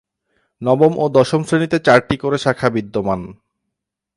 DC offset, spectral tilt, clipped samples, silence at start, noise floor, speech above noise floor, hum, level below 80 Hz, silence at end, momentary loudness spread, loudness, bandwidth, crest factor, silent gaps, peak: under 0.1%; -6.5 dB/octave; under 0.1%; 0.6 s; -80 dBFS; 64 dB; none; -48 dBFS; 0.85 s; 10 LU; -16 LUFS; 11.5 kHz; 18 dB; none; 0 dBFS